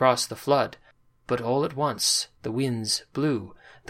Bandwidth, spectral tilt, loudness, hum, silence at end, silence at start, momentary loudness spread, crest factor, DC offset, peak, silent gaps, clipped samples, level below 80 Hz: 16.5 kHz; -3.5 dB/octave; -26 LUFS; none; 0.35 s; 0 s; 9 LU; 20 dB; under 0.1%; -6 dBFS; none; under 0.1%; -62 dBFS